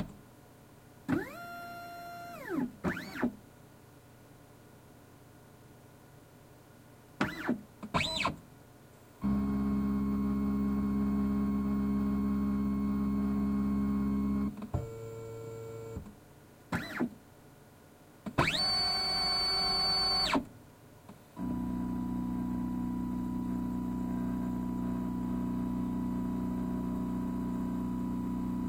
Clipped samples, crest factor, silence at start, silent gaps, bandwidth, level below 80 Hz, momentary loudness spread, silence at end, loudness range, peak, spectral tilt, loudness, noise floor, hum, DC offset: under 0.1%; 22 dB; 0 s; none; 16.5 kHz; -48 dBFS; 16 LU; 0 s; 11 LU; -12 dBFS; -5.5 dB/octave; -33 LUFS; -57 dBFS; none; under 0.1%